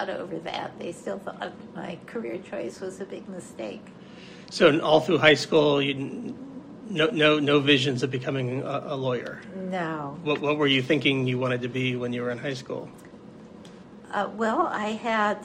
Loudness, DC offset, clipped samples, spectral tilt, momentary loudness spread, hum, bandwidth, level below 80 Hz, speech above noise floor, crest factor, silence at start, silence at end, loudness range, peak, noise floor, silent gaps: -25 LUFS; under 0.1%; under 0.1%; -5.5 dB/octave; 19 LU; none; 10.5 kHz; -68 dBFS; 20 dB; 24 dB; 0 s; 0 s; 13 LU; -2 dBFS; -46 dBFS; none